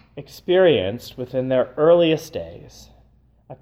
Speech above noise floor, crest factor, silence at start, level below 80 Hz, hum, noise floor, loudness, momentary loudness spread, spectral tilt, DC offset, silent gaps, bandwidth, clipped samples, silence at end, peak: 36 dB; 16 dB; 0.15 s; -54 dBFS; none; -55 dBFS; -19 LUFS; 18 LU; -6 dB/octave; under 0.1%; none; 15.5 kHz; under 0.1%; 0.1 s; -4 dBFS